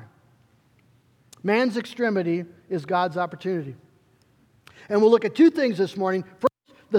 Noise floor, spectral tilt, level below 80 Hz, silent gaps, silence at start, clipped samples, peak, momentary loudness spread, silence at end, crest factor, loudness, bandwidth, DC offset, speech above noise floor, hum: -61 dBFS; -7 dB/octave; -74 dBFS; none; 0 s; under 0.1%; -6 dBFS; 12 LU; 0 s; 20 dB; -23 LUFS; 11.5 kHz; under 0.1%; 39 dB; none